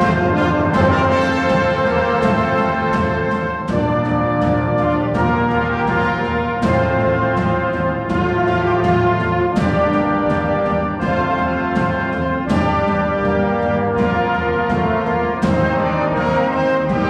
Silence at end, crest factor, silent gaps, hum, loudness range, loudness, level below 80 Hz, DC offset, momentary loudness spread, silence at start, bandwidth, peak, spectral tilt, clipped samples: 0 s; 14 dB; none; none; 1 LU; -17 LUFS; -34 dBFS; under 0.1%; 3 LU; 0 s; 10 kHz; -2 dBFS; -7.5 dB/octave; under 0.1%